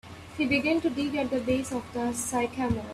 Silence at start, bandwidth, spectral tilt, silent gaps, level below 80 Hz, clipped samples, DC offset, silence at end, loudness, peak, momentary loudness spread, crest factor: 0.05 s; 15 kHz; -4.5 dB/octave; none; -54 dBFS; under 0.1%; under 0.1%; 0 s; -28 LUFS; -14 dBFS; 7 LU; 16 dB